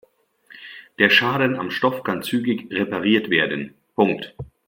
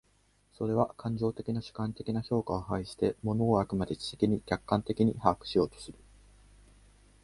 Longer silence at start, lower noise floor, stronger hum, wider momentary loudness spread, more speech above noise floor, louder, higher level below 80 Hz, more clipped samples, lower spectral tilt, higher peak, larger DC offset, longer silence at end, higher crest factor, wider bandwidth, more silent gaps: about the same, 0.55 s vs 0.6 s; second, -53 dBFS vs -68 dBFS; second, none vs 50 Hz at -55 dBFS; first, 21 LU vs 8 LU; second, 32 dB vs 37 dB; first, -20 LUFS vs -31 LUFS; second, -60 dBFS vs -54 dBFS; neither; second, -5.5 dB/octave vs -7.5 dB/octave; first, 0 dBFS vs -8 dBFS; neither; second, 0.2 s vs 1.3 s; about the same, 22 dB vs 24 dB; first, 16.5 kHz vs 11.5 kHz; neither